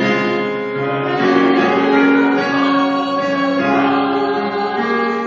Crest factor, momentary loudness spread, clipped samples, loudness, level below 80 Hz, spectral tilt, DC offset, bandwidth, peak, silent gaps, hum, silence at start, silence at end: 14 dB; 6 LU; under 0.1%; -15 LUFS; -58 dBFS; -6 dB/octave; under 0.1%; 7.2 kHz; -2 dBFS; none; none; 0 s; 0 s